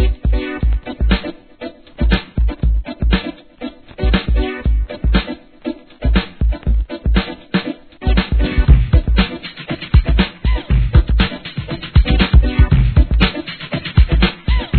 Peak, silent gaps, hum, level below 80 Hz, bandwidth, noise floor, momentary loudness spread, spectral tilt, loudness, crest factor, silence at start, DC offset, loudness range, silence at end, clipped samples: 0 dBFS; none; none; -16 dBFS; 4.5 kHz; -33 dBFS; 15 LU; -9.5 dB/octave; -17 LUFS; 14 dB; 0 s; 0.2%; 5 LU; 0 s; under 0.1%